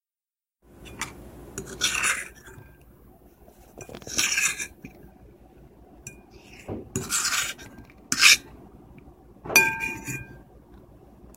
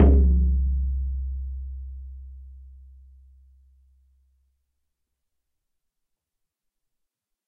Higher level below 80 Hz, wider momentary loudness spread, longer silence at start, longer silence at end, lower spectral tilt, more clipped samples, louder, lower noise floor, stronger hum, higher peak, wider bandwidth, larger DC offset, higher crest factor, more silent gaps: second, -54 dBFS vs -28 dBFS; about the same, 27 LU vs 25 LU; first, 0.8 s vs 0 s; second, 0.05 s vs 4.8 s; second, -0.5 dB/octave vs -12.5 dB/octave; neither; about the same, -23 LUFS vs -25 LUFS; first, under -90 dBFS vs -83 dBFS; neither; first, 0 dBFS vs -6 dBFS; first, 16.5 kHz vs 2.1 kHz; neither; first, 30 dB vs 22 dB; neither